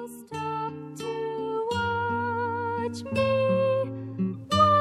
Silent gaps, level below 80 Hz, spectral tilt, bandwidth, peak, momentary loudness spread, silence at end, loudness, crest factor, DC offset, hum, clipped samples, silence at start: none; -60 dBFS; -6 dB/octave; 13.5 kHz; -8 dBFS; 10 LU; 0 s; -28 LUFS; 18 dB; under 0.1%; none; under 0.1%; 0 s